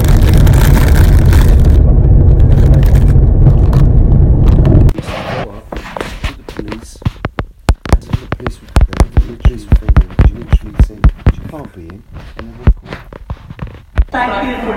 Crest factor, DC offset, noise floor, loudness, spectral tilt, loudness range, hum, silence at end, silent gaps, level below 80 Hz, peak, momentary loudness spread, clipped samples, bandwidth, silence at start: 10 dB; under 0.1%; -31 dBFS; -11 LUFS; -7.5 dB/octave; 11 LU; none; 0 s; none; -12 dBFS; 0 dBFS; 19 LU; 2%; 16.5 kHz; 0 s